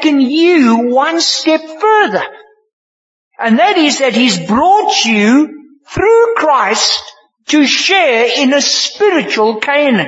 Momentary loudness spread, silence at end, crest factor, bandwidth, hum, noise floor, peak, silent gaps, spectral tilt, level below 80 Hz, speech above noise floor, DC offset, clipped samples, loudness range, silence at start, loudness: 5 LU; 0 s; 12 dB; 8 kHz; none; under -90 dBFS; 0 dBFS; 2.73-3.31 s; -3 dB/octave; -48 dBFS; over 80 dB; under 0.1%; under 0.1%; 2 LU; 0 s; -10 LUFS